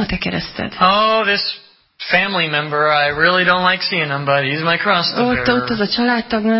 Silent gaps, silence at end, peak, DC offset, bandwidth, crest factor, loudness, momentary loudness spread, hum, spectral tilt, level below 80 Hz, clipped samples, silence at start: none; 0 s; 0 dBFS; under 0.1%; 5.8 kHz; 16 dB; -15 LUFS; 8 LU; none; -8.5 dB/octave; -44 dBFS; under 0.1%; 0 s